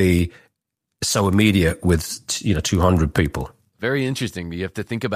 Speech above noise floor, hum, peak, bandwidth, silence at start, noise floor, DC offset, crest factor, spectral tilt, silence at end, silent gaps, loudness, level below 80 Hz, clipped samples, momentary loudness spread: 60 dB; none; -4 dBFS; 15.5 kHz; 0 s; -80 dBFS; under 0.1%; 18 dB; -5 dB/octave; 0 s; none; -21 LUFS; -36 dBFS; under 0.1%; 11 LU